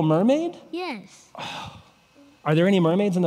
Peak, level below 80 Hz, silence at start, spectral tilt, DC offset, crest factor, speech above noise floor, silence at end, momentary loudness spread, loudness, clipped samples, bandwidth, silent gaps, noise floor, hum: -8 dBFS; -68 dBFS; 0 s; -7.5 dB/octave; under 0.1%; 16 dB; 32 dB; 0 s; 18 LU; -23 LUFS; under 0.1%; 12 kHz; none; -55 dBFS; none